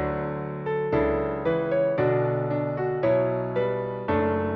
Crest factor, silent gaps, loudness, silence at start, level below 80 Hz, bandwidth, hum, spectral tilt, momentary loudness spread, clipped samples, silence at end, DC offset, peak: 14 dB; none; -25 LUFS; 0 s; -46 dBFS; 5.4 kHz; none; -7 dB/octave; 6 LU; under 0.1%; 0 s; under 0.1%; -12 dBFS